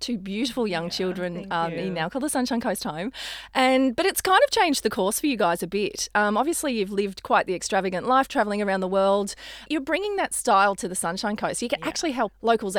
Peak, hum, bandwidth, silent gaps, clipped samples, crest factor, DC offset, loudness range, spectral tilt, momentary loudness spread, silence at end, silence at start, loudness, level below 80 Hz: -6 dBFS; none; over 20 kHz; none; under 0.1%; 20 dB; under 0.1%; 3 LU; -3.5 dB/octave; 8 LU; 0 s; 0 s; -24 LUFS; -54 dBFS